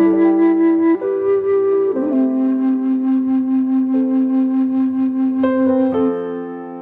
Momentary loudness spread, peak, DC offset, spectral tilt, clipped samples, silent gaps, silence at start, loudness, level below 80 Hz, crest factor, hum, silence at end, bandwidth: 4 LU; -4 dBFS; under 0.1%; -10 dB/octave; under 0.1%; none; 0 s; -16 LUFS; -64 dBFS; 12 dB; none; 0 s; 3.6 kHz